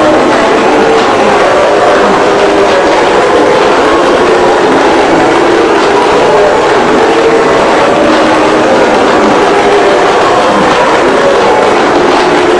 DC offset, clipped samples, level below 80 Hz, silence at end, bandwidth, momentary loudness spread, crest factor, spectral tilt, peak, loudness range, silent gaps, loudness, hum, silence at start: under 0.1%; 3%; -36 dBFS; 0 s; 12 kHz; 1 LU; 6 dB; -4 dB/octave; 0 dBFS; 0 LU; none; -6 LUFS; none; 0 s